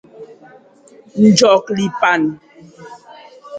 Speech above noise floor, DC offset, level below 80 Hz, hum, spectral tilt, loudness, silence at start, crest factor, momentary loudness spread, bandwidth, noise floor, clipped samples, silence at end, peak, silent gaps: 33 dB; under 0.1%; -60 dBFS; none; -4.5 dB/octave; -13 LUFS; 0.2 s; 18 dB; 16 LU; 9.2 kHz; -46 dBFS; under 0.1%; 0 s; 0 dBFS; none